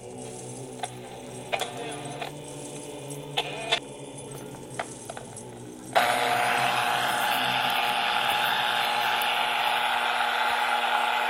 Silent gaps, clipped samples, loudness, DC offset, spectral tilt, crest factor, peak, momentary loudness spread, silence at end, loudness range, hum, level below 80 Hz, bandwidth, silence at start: none; under 0.1%; -26 LUFS; under 0.1%; -2 dB/octave; 22 dB; -6 dBFS; 16 LU; 0 s; 10 LU; none; -64 dBFS; 16 kHz; 0 s